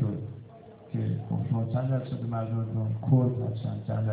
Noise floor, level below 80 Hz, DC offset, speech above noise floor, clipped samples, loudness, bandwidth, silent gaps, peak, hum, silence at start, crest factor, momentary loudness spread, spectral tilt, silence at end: -49 dBFS; -56 dBFS; under 0.1%; 21 dB; under 0.1%; -30 LUFS; 4 kHz; none; -12 dBFS; none; 0 s; 18 dB; 14 LU; -13 dB/octave; 0 s